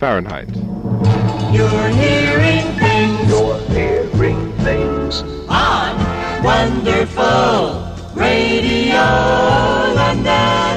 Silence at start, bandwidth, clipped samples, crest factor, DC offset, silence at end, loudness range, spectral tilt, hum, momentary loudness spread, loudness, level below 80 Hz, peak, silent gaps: 0 s; 9.6 kHz; under 0.1%; 12 dB; under 0.1%; 0 s; 2 LU; -6 dB/octave; none; 7 LU; -15 LUFS; -30 dBFS; -2 dBFS; none